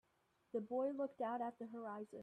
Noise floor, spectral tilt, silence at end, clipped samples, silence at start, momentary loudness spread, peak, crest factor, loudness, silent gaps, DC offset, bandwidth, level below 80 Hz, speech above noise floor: -80 dBFS; -8 dB/octave; 0 s; under 0.1%; 0.55 s; 8 LU; -30 dBFS; 14 dB; -45 LUFS; none; under 0.1%; 9.6 kHz; -90 dBFS; 36 dB